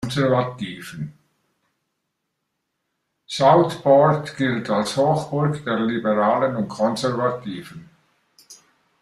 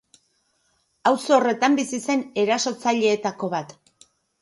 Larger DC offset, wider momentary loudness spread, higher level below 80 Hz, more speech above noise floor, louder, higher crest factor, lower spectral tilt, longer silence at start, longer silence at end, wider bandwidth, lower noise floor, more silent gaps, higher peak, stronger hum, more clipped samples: neither; first, 17 LU vs 9 LU; first, -60 dBFS vs -72 dBFS; first, 57 dB vs 47 dB; about the same, -20 LUFS vs -22 LUFS; about the same, 18 dB vs 18 dB; first, -6 dB/octave vs -3.5 dB/octave; second, 0 s vs 1.05 s; second, 0.45 s vs 0.75 s; first, 13 kHz vs 11.5 kHz; first, -77 dBFS vs -68 dBFS; neither; about the same, -4 dBFS vs -4 dBFS; neither; neither